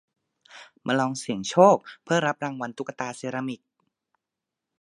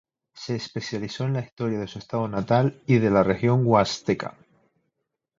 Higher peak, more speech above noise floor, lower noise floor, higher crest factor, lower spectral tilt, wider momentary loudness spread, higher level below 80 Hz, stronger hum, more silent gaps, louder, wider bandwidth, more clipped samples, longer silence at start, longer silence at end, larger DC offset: about the same, -4 dBFS vs -4 dBFS; first, 62 dB vs 56 dB; first, -87 dBFS vs -80 dBFS; about the same, 24 dB vs 20 dB; second, -5 dB/octave vs -7 dB/octave; first, 15 LU vs 12 LU; second, -72 dBFS vs -54 dBFS; neither; second, none vs 1.52-1.57 s; about the same, -25 LUFS vs -24 LUFS; first, 11.5 kHz vs 7.6 kHz; neither; first, 0.55 s vs 0.35 s; first, 1.25 s vs 1.1 s; neither